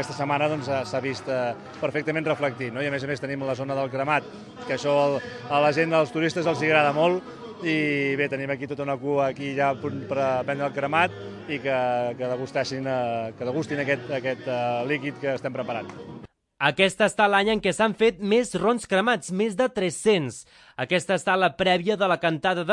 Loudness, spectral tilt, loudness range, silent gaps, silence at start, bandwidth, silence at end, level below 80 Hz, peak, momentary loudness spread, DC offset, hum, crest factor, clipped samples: -25 LUFS; -5 dB/octave; 5 LU; none; 0 s; 11.5 kHz; 0 s; -62 dBFS; -4 dBFS; 9 LU; under 0.1%; none; 20 dB; under 0.1%